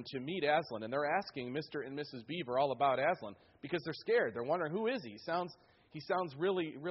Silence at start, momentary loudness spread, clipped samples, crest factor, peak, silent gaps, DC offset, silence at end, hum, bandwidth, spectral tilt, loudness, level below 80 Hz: 0 s; 11 LU; under 0.1%; 18 dB; -18 dBFS; none; under 0.1%; 0 s; none; 5.8 kHz; -3.5 dB/octave; -36 LUFS; -78 dBFS